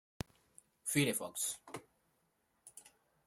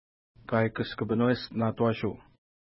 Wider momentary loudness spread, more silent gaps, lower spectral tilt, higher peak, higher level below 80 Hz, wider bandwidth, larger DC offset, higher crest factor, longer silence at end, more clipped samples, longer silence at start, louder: first, 23 LU vs 7 LU; neither; second, -3.5 dB/octave vs -11 dB/octave; second, -18 dBFS vs -12 dBFS; second, -68 dBFS vs -60 dBFS; first, 16 kHz vs 5.8 kHz; neither; first, 24 dB vs 18 dB; second, 0.4 s vs 0.6 s; neither; first, 0.85 s vs 0.5 s; second, -37 LUFS vs -29 LUFS